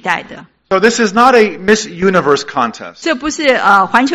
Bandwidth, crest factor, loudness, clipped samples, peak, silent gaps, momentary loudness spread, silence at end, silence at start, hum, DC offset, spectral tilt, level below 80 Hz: 13.5 kHz; 12 dB; -12 LUFS; 0.9%; 0 dBFS; none; 9 LU; 0 s; 0.05 s; none; under 0.1%; -4 dB/octave; -48 dBFS